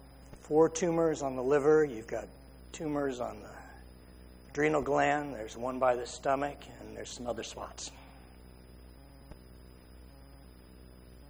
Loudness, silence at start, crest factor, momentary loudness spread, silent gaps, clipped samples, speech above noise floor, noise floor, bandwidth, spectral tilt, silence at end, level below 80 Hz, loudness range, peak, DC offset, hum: -32 LUFS; 0 s; 20 dB; 25 LU; none; under 0.1%; 22 dB; -53 dBFS; over 20 kHz; -5 dB/octave; 0 s; -54 dBFS; 14 LU; -14 dBFS; under 0.1%; none